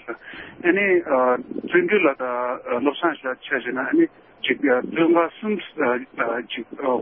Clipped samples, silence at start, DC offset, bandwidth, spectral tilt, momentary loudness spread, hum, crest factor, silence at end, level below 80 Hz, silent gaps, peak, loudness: under 0.1%; 0.05 s; under 0.1%; 3.7 kHz; -10 dB/octave; 9 LU; none; 18 dB; 0 s; -66 dBFS; none; -4 dBFS; -22 LUFS